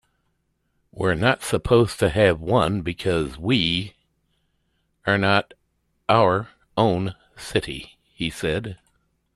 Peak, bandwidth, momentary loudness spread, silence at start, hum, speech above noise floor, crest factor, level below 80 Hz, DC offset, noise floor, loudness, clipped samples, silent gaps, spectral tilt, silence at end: -2 dBFS; 13.5 kHz; 12 LU; 0.95 s; none; 50 dB; 20 dB; -46 dBFS; under 0.1%; -71 dBFS; -22 LUFS; under 0.1%; none; -5.5 dB/octave; 0.6 s